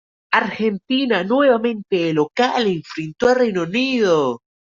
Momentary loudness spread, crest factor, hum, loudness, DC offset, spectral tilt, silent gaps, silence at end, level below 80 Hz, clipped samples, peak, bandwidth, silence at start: 6 LU; 16 dB; none; -18 LUFS; under 0.1%; -5.5 dB/octave; none; 0.25 s; -58 dBFS; under 0.1%; -2 dBFS; 7.6 kHz; 0.3 s